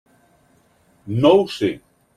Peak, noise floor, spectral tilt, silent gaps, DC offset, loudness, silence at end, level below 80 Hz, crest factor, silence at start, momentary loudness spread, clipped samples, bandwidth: -2 dBFS; -58 dBFS; -7 dB/octave; none; under 0.1%; -18 LUFS; 0.4 s; -58 dBFS; 18 dB; 1.05 s; 13 LU; under 0.1%; 12.5 kHz